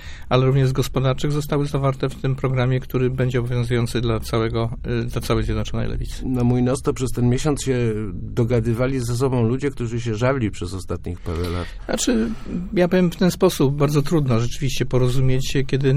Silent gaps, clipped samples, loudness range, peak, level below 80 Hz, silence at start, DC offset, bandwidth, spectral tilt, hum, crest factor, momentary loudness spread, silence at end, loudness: none; under 0.1%; 3 LU; -4 dBFS; -32 dBFS; 0 s; under 0.1%; 16 kHz; -6.5 dB/octave; none; 16 dB; 8 LU; 0 s; -21 LUFS